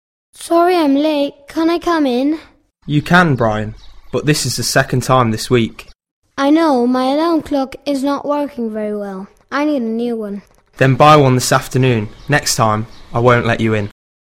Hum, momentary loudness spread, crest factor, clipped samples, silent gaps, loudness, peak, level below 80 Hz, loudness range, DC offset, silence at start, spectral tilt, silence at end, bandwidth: none; 11 LU; 16 dB; under 0.1%; 6.11-6.22 s; -15 LUFS; 0 dBFS; -42 dBFS; 5 LU; under 0.1%; 0.4 s; -5.5 dB/octave; 0.5 s; 16.5 kHz